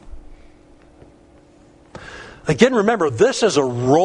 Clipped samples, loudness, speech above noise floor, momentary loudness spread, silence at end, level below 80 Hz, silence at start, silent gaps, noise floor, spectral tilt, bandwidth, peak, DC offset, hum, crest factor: under 0.1%; -17 LUFS; 33 dB; 22 LU; 0 s; -46 dBFS; 0.05 s; none; -49 dBFS; -5 dB/octave; 10.5 kHz; 0 dBFS; under 0.1%; none; 20 dB